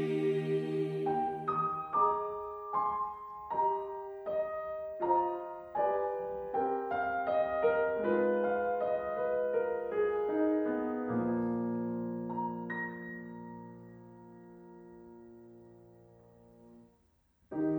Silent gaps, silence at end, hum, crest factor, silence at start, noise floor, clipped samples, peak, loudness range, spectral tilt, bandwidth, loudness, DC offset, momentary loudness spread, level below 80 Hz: none; 0 s; none; 18 dB; 0 s; -70 dBFS; under 0.1%; -16 dBFS; 13 LU; -9 dB/octave; over 20 kHz; -33 LUFS; under 0.1%; 21 LU; -68 dBFS